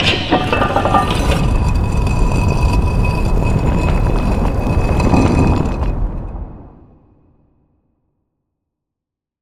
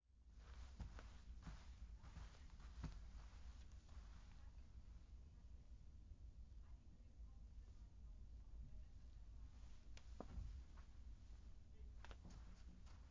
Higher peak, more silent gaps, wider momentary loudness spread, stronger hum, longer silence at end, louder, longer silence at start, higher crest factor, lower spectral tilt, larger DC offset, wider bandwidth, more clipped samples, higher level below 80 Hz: first, 0 dBFS vs -36 dBFS; neither; about the same, 8 LU vs 7 LU; neither; first, 2.7 s vs 0 s; first, -16 LUFS vs -62 LUFS; about the same, 0 s vs 0.05 s; second, 16 dB vs 22 dB; about the same, -6.5 dB/octave vs -6 dB/octave; neither; first, 14 kHz vs 7.2 kHz; neither; first, -20 dBFS vs -60 dBFS